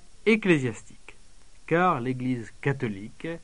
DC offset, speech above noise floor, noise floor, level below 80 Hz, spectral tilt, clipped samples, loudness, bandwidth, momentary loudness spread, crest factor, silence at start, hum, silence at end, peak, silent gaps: 0.5%; 27 dB; -53 dBFS; -54 dBFS; -6.5 dB/octave; under 0.1%; -26 LUFS; 10.5 kHz; 13 LU; 20 dB; 0.25 s; none; 0.05 s; -6 dBFS; none